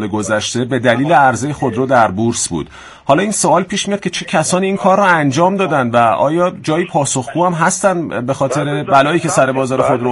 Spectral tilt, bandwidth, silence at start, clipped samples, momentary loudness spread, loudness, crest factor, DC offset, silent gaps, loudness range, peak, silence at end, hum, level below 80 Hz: -4.5 dB/octave; 11.5 kHz; 0 s; under 0.1%; 7 LU; -14 LUFS; 14 dB; under 0.1%; none; 2 LU; 0 dBFS; 0 s; none; -50 dBFS